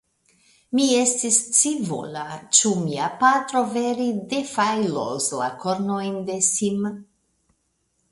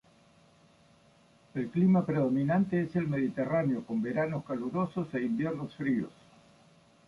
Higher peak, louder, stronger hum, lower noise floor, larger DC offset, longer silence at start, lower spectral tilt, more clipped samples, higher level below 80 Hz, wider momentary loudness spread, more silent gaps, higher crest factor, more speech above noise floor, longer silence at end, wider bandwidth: first, 0 dBFS vs -16 dBFS; first, -21 LUFS vs -31 LUFS; neither; first, -71 dBFS vs -62 dBFS; neither; second, 0.7 s vs 1.55 s; second, -3 dB/octave vs -9.5 dB/octave; neither; about the same, -66 dBFS vs -66 dBFS; about the same, 10 LU vs 9 LU; neither; first, 22 dB vs 14 dB; first, 48 dB vs 33 dB; about the same, 1.1 s vs 1 s; about the same, 11.5 kHz vs 10.5 kHz